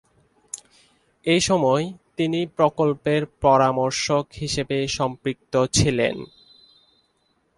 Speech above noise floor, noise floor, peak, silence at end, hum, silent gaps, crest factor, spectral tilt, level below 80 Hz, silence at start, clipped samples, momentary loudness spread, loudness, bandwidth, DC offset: 46 dB; -67 dBFS; -4 dBFS; 1.3 s; none; none; 20 dB; -4.5 dB/octave; -48 dBFS; 0.55 s; under 0.1%; 15 LU; -22 LUFS; 11.5 kHz; under 0.1%